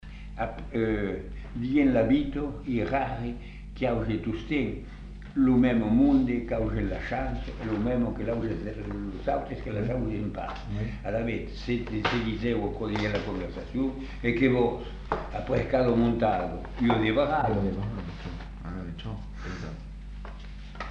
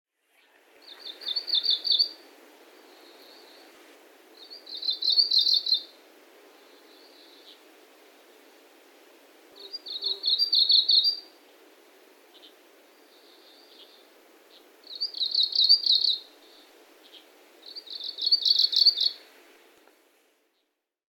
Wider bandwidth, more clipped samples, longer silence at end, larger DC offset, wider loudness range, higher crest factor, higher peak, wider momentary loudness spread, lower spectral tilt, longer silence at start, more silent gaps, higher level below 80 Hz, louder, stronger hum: second, 7.4 kHz vs 18 kHz; neither; second, 0 s vs 2 s; neither; about the same, 6 LU vs 7 LU; about the same, 18 dB vs 22 dB; about the same, -10 dBFS vs -8 dBFS; second, 15 LU vs 22 LU; first, -8 dB/octave vs 2.5 dB/octave; second, 0 s vs 1 s; neither; first, -40 dBFS vs under -90 dBFS; second, -29 LUFS vs -22 LUFS; neither